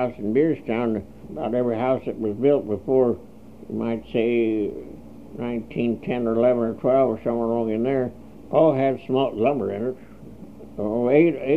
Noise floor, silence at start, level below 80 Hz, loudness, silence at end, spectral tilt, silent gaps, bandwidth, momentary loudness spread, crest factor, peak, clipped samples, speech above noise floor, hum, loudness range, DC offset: -42 dBFS; 0 s; -54 dBFS; -23 LUFS; 0 s; -9 dB/octave; none; 5.2 kHz; 14 LU; 18 dB; -4 dBFS; under 0.1%; 20 dB; none; 3 LU; 0.4%